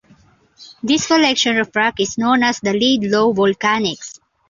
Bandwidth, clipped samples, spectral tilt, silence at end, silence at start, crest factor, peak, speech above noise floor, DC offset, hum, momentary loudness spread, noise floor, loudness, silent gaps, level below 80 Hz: 7.6 kHz; under 0.1%; -3.5 dB/octave; 0.35 s; 0.6 s; 16 dB; -2 dBFS; 35 dB; under 0.1%; none; 7 LU; -52 dBFS; -16 LUFS; none; -56 dBFS